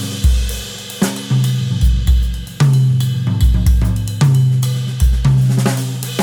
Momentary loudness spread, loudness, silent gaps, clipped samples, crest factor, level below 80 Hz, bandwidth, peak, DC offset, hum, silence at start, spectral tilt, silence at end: 7 LU; -15 LUFS; none; under 0.1%; 12 dB; -18 dBFS; 17.5 kHz; -2 dBFS; under 0.1%; none; 0 s; -6 dB/octave; 0 s